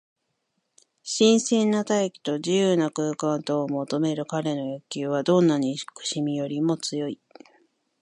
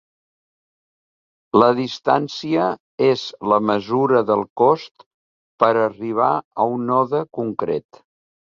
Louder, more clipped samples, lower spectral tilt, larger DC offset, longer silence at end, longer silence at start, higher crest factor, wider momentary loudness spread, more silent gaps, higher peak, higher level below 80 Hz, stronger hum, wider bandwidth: second, -24 LUFS vs -19 LUFS; neither; second, -5 dB/octave vs -6.5 dB/octave; neither; first, 0.9 s vs 0.7 s; second, 1.05 s vs 1.55 s; about the same, 18 dB vs 20 dB; first, 11 LU vs 7 LU; second, none vs 2.80-2.98 s, 4.50-4.56 s, 4.91-4.95 s, 5.06-5.58 s, 6.45-6.51 s; second, -8 dBFS vs 0 dBFS; second, -72 dBFS vs -62 dBFS; neither; first, 11 kHz vs 7.4 kHz